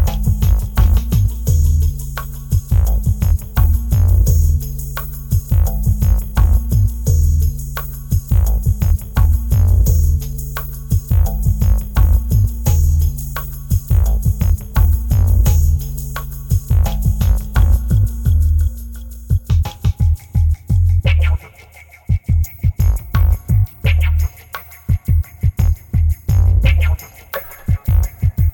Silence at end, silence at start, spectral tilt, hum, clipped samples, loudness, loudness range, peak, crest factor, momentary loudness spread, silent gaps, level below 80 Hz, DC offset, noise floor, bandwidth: 0 s; 0 s; -6.5 dB/octave; none; under 0.1%; -17 LUFS; 1 LU; -4 dBFS; 10 dB; 10 LU; none; -16 dBFS; under 0.1%; -41 dBFS; 20 kHz